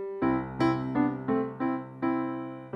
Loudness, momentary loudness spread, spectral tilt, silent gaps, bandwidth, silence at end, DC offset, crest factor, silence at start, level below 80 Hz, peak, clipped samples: -30 LUFS; 4 LU; -8.5 dB/octave; none; 7.4 kHz; 0 s; under 0.1%; 14 dB; 0 s; -56 dBFS; -14 dBFS; under 0.1%